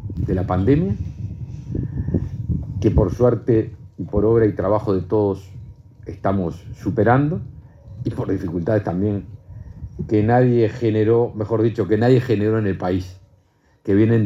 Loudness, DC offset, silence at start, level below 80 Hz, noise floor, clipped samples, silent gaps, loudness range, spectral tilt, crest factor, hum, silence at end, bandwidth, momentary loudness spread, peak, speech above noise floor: -20 LUFS; under 0.1%; 0 s; -38 dBFS; -58 dBFS; under 0.1%; none; 4 LU; -9.5 dB/octave; 18 dB; none; 0 s; 7.6 kHz; 16 LU; -2 dBFS; 40 dB